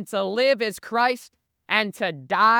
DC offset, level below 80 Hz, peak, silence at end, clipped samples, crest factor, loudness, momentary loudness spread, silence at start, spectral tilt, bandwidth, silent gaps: under 0.1%; -72 dBFS; -4 dBFS; 0 s; under 0.1%; 20 dB; -23 LUFS; 6 LU; 0 s; -3.5 dB/octave; 19 kHz; none